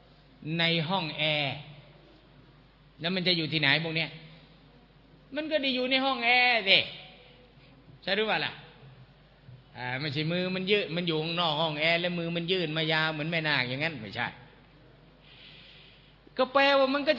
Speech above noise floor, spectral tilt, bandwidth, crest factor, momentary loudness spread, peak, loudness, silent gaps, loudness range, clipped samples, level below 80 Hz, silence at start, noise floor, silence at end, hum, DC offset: 29 dB; -6.5 dB/octave; 6 kHz; 26 dB; 14 LU; -4 dBFS; -27 LUFS; none; 6 LU; under 0.1%; -64 dBFS; 0.4 s; -57 dBFS; 0 s; none; under 0.1%